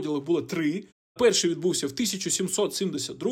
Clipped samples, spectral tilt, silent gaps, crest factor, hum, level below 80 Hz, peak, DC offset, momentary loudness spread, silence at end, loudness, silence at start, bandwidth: under 0.1%; -3.5 dB/octave; 0.92-1.15 s; 16 dB; none; -66 dBFS; -10 dBFS; under 0.1%; 8 LU; 0 s; -26 LUFS; 0 s; 16.5 kHz